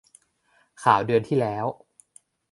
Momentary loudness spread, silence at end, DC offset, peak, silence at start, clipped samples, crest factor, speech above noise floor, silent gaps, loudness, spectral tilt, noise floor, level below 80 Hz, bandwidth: 11 LU; 0.8 s; under 0.1%; -4 dBFS; 0.8 s; under 0.1%; 22 dB; 43 dB; none; -23 LUFS; -6.5 dB/octave; -65 dBFS; -64 dBFS; 11.5 kHz